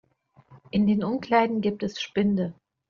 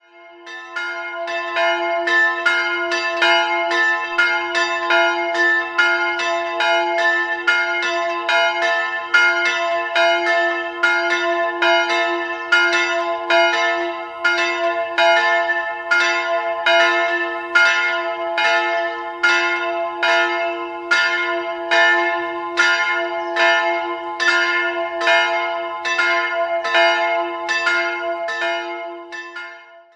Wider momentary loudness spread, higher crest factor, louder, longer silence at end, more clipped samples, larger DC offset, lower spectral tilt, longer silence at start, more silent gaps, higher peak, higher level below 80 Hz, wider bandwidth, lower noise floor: about the same, 7 LU vs 8 LU; about the same, 18 dB vs 18 dB; second, -25 LUFS vs -17 LUFS; first, 0.35 s vs 0.15 s; neither; neither; first, -5.5 dB/octave vs -0.5 dB/octave; first, 0.5 s vs 0.15 s; neither; second, -8 dBFS vs -2 dBFS; first, -58 dBFS vs -66 dBFS; second, 7 kHz vs 11 kHz; first, -58 dBFS vs -41 dBFS